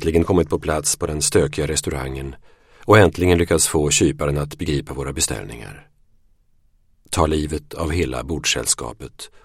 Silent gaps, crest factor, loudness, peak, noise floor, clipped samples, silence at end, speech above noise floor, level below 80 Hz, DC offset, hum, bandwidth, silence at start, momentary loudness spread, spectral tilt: none; 20 dB; -19 LUFS; 0 dBFS; -57 dBFS; under 0.1%; 0.2 s; 38 dB; -34 dBFS; under 0.1%; none; 16.5 kHz; 0 s; 17 LU; -4 dB/octave